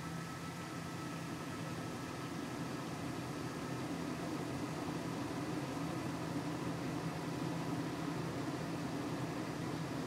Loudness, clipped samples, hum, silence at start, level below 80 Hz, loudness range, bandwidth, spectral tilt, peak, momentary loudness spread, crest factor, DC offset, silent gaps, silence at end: -42 LUFS; under 0.1%; none; 0 s; -68 dBFS; 2 LU; 16 kHz; -5.5 dB/octave; -28 dBFS; 3 LU; 14 dB; under 0.1%; none; 0 s